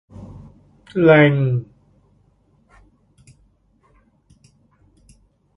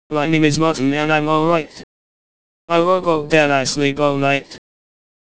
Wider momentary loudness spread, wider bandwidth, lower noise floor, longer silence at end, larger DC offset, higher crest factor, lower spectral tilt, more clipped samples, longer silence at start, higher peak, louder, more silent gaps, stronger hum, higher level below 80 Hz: first, 28 LU vs 4 LU; second, 5.6 kHz vs 8 kHz; second, -59 dBFS vs under -90 dBFS; first, 3.95 s vs 0.75 s; second, under 0.1% vs 2%; about the same, 22 dB vs 18 dB; first, -9 dB/octave vs -5 dB/octave; neither; about the same, 0.2 s vs 0.1 s; about the same, 0 dBFS vs 0 dBFS; about the same, -16 LUFS vs -16 LUFS; second, none vs 1.83-2.68 s; neither; about the same, -54 dBFS vs -54 dBFS